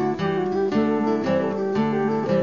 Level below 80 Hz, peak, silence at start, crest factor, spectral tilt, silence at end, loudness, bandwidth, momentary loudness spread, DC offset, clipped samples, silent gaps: -60 dBFS; -10 dBFS; 0 s; 12 dB; -8 dB/octave; 0 s; -22 LUFS; 7.2 kHz; 2 LU; 0.3%; under 0.1%; none